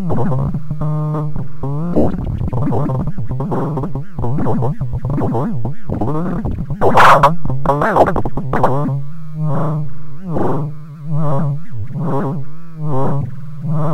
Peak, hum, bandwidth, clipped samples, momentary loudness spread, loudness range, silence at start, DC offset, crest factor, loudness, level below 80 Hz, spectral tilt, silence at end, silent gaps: 0 dBFS; none; 15.5 kHz; 0.2%; 11 LU; 7 LU; 0 s; under 0.1%; 14 dB; -18 LUFS; -32 dBFS; -8 dB/octave; 0 s; none